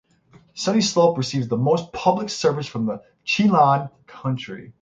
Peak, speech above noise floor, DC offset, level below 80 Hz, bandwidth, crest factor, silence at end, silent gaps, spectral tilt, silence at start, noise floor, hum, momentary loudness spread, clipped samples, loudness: -4 dBFS; 33 dB; under 0.1%; -60 dBFS; 9.2 kHz; 18 dB; 0.1 s; none; -5.5 dB/octave; 0.55 s; -54 dBFS; none; 13 LU; under 0.1%; -21 LUFS